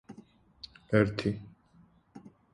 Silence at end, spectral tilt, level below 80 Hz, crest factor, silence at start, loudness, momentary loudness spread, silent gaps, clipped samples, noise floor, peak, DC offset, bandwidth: 0.25 s; -7.5 dB/octave; -58 dBFS; 24 dB; 0.1 s; -30 LUFS; 26 LU; none; under 0.1%; -62 dBFS; -10 dBFS; under 0.1%; 10.5 kHz